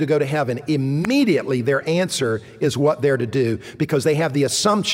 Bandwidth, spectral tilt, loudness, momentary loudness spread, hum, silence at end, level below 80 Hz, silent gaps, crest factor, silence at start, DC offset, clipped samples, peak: 16 kHz; -5 dB/octave; -20 LUFS; 5 LU; none; 0 s; -58 dBFS; none; 14 dB; 0 s; under 0.1%; under 0.1%; -4 dBFS